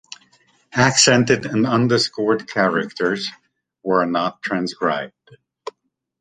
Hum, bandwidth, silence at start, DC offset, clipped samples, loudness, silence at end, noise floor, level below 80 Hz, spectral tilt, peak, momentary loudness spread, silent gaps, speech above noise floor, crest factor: none; 9.6 kHz; 0.75 s; under 0.1%; under 0.1%; -18 LUFS; 0.5 s; -69 dBFS; -58 dBFS; -3.5 dB/octave; -2 dBFS; 19 LU; none; 50 dB; 18 dB